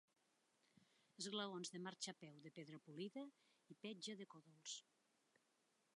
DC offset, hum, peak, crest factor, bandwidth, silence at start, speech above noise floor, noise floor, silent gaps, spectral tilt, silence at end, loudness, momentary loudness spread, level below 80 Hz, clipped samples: under 0.1%; none; -34 dBFS; 22 dB; 11 kHz; 0.8 s; 30 dB; -84 dBFS; none; -3 dB/octave; 1.15 s; -53 LUFS; 12 LU; under -90 dBFS; under 0.1%